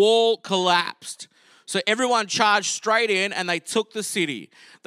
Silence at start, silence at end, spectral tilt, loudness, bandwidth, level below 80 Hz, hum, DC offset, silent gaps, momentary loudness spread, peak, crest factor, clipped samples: 0 s; 0.4 s; -2.5 dB/octave; -22 LUFS; 14.5 kHz; -82 dBFS; none; under 0.1%; none; 11 LU; -4 dBFS; 20 dB; under 0.1%